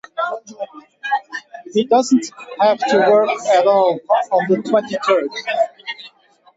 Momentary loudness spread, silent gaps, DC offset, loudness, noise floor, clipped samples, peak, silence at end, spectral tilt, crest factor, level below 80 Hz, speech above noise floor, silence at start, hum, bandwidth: 17 LU; none; under 0.1%; -17 LUFS; -49 dBFS; under 0.1%; -4 dBFS; 0.5 s; -4.5 dB/octave; 14 dB; -70 dBFS; 33 dB; 0.15 s; none; 8 kHz